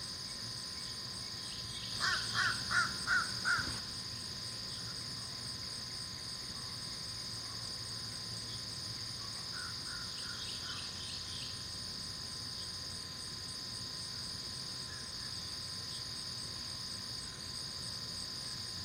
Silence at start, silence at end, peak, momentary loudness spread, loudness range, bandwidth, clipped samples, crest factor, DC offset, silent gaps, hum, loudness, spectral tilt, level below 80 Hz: 0 s; 0 s; -20 dBFS; 8 LU; 6 LU; 16 kHz; under 0.1%; 22 dB; under 0.1%; none; none; -39 LUFS; -1.5 dB/octave; -62 dBFS